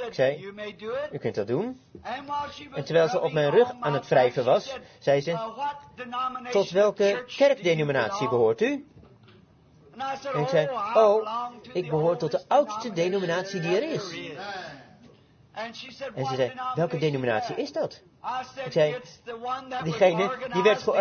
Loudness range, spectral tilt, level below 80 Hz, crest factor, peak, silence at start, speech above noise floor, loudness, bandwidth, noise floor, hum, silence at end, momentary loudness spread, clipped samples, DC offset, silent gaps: 6 LU; -5.5 dB/octave; -68 dBFS; 18 dB; -8 dBFS; 0 s; 30 dB; -26 LUFS; 6.8 kHz; -56 dBFS; none; 0 s; 14 LU; under 0.1%; under 0.1%; none